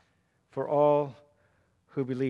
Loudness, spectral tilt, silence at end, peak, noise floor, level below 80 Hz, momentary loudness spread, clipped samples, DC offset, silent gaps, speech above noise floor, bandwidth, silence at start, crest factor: -28 LUFS; -9 dB/octave; 0 s; -12 dBFS; -71 dBFS; -76 dBFS; 15 LU; under 0.1%; under 0.1%; none; 44 dB; 6.6 kHz; 0.55 s; 18 dB